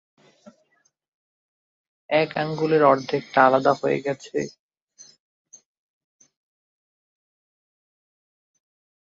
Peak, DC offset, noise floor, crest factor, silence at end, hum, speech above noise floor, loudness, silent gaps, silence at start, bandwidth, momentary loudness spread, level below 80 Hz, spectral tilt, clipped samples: -2 dBFS; under 0.1%; -67 dBFS; 24 dB; 4.65 s; none; 47 dB; -21 LUFS; none; 2.1 s; 7.8 kHz; 12 LU; -72 dBFS; -6 dB/octave; under 0.1%